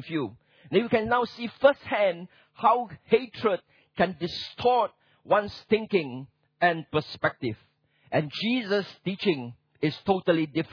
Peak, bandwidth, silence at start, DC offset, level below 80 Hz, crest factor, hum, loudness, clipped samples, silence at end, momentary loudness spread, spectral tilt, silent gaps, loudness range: -6 dBFS; 5.4 kHz; 0 s; under 0.1%; -62 dBFS; 22 dB; none; -27 LUFS; under 0.1%; 0.05 s; 10 LU; -7 dB/octave; none; 3 LU